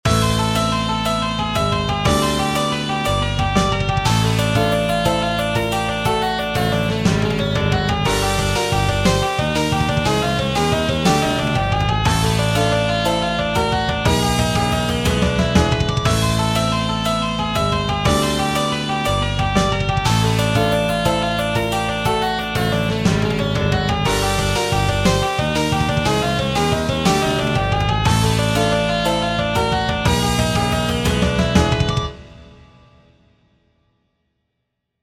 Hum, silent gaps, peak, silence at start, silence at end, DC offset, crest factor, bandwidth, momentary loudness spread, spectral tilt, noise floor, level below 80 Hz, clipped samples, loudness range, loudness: none; none; -2 dBFS; 0.05 s; 2.55 s; under 0.1%; 16 dB; 16.5 kHz; 3 LU; -5 dB/octave; -75 dBFS; -30 dBFS; under 0.1%; 1 LU; -18 LUFS